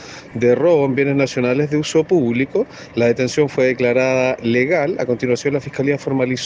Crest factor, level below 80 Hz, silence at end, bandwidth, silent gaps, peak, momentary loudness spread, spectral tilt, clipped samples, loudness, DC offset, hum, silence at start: 14 dB; -54 dBFS; 0 s; 9.6 kHz; none; -4 dBFS; 5 LU; -6 dB/octave; under 0.1%; -17 LUFS; under 0.1%; none; 0 s